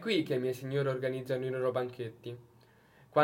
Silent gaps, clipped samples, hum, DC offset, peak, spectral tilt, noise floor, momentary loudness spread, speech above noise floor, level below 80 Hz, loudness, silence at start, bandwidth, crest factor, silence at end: none; under 0.1%; none; under 0.1%; -12 dBFS; -6.5 dB/octave; -62 dBFS; 14 LU; 28 dB; -76 dBFS; -34 LUFS; 0 s; 16.5 kHz; 22 dB; 0 s